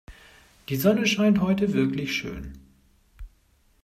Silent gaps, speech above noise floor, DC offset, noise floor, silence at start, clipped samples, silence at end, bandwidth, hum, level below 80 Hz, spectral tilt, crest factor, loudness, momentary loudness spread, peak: none; 39 dB; under 0.1%; -62 dBFS; 0.1 s; under 0.1%; 0.55 s; 16 kHz; none; -48 dBFS; -5.5 dB/octave; 18 dB; -23 LUFS; 18 LU; -8 dBFS